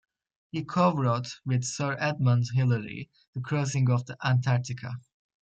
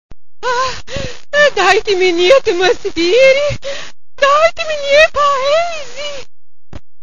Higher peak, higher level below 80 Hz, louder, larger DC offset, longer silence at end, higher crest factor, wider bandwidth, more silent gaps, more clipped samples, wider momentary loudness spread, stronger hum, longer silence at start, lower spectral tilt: second, -12 dBFS vs 0 dBFS; second, -66 dBFS vs -40 dBFS; second, -27 LUFS vs -12 LUFS; second, under 0.1% vs 7%; second, 0.45 s vs 0.8 s; about the same, 16 dB vs 14 dB; about the same, 8.8 kHz vs 9.2 kHz; first, 3.28-3.33 s vs none; second, under 0.1% vs 0.2%; about the same, 14 LU vs 15 LU; neither; first, 0.55 s vs 0.1 s; first, -6 dB/octave vs -3 dB/octave